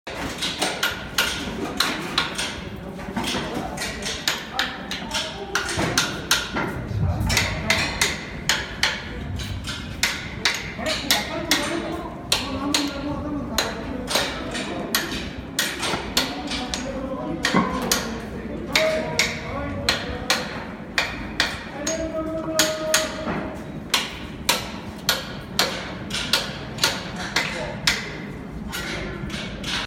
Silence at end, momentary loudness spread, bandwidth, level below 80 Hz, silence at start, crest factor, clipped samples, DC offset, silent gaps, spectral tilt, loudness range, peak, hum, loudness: 0 s; 9 LU; 17.5 kHz; -40 dBFS; 0.05 s; 22 dB; under 0.1%; under 0.1%; none; -2.5 dB/octave; 3 LU; -2 dBFS; none; -24 LUFS